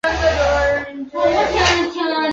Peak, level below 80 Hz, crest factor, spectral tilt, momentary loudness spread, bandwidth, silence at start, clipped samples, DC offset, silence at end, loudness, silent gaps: -2 dBFS; -32 dBFS; 16 dB; -4 dB/octave; 5 LU; 8.4 kHz; 0.05 s; under 0.1%; under 0.1%; 0 s; -17 LUFS; none